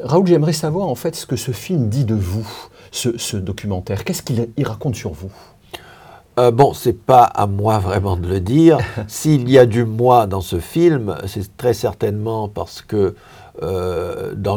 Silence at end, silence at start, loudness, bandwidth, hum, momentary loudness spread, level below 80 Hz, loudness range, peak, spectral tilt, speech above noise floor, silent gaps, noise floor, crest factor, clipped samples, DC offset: 0 s; 0 s; -17 LUFS; over 20 kHz; none; 14 LU; -46 dBFS; 9 LU; 0 dBFS; -6.5 dB/octave; 26 dB; none; -43 dBFS; 16 dB; under 0.1%; under 0.1%